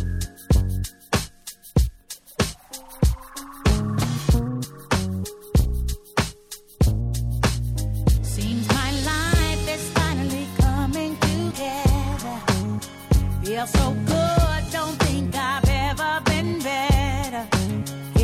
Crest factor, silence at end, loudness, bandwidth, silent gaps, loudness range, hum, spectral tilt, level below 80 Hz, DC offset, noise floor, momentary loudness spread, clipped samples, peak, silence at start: 16 dB; 0 s; -23 LUFS; 16.5 kHz; none; 3 LU; none; -5 dB/octave; -28 dBFS; under 0.1%; -43 dBFS; 8 LU; under 0.1%; -6 dBFS; 0 s